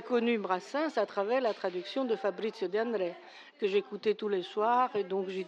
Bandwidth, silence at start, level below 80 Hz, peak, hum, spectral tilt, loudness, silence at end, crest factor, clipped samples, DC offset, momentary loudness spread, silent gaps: 8.4 kHz; 0 s; under -90 dBFS; -16 dBFS; none; -5.5 dB/octave; -32 LUFS; 0 s; 16 dB; under 0.1%; under 0.1%; 7 LU; none